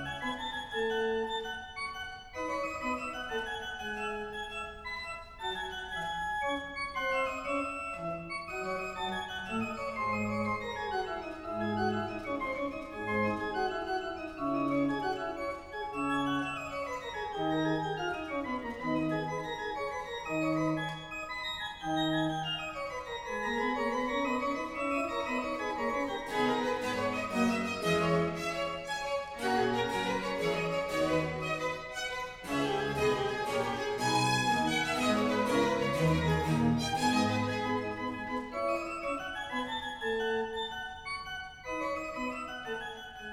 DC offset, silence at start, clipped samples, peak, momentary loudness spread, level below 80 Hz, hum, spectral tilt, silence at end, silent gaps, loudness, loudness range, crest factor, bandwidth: under 0.1%; 0 s; under 0.1%; -16 dBFS; 9 LU; -56 dBFS; none; -5 dB/octave; 0 s; none; -33 LUFS; 6 LU; 18 dB; 16.5 kHz